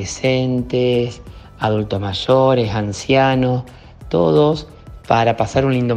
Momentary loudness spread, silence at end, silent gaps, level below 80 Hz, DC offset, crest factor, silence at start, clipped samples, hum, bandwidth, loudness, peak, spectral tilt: 10 LU; 0 s; none; -40 dBFS; under 0.1%; 16 dB; 0 s; under 0.1%; none; 9.8 kHz; -17 LUFS; 0 dBFS; -6 dB/octave